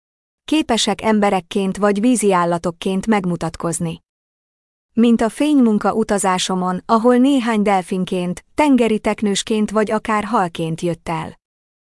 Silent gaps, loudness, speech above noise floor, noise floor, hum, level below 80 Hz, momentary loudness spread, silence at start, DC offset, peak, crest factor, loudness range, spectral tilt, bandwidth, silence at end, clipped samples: 4.09-4.89 s; -17 LUFS; over 73 dB; under -90 dBFS; none; -48 dBFS; 9 LU; 0.5 s; under 0.1%; -4 dBFS; 14 dB; 3 LU; -5 dB/octave; 12 kHz; 0.65 s; under 0.1%